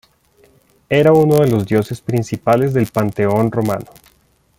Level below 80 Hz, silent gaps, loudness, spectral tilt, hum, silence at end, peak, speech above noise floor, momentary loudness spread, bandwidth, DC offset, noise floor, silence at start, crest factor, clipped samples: -50 dBFS; none; -15 LUFS; -7.5 dB/octave; none; 0.75 s; -2 dBFS; 42 dB; 9 LU; 17 kHz; under 0.1%; -56 dBFS; 0.9 s; 14 dB; under 0.1%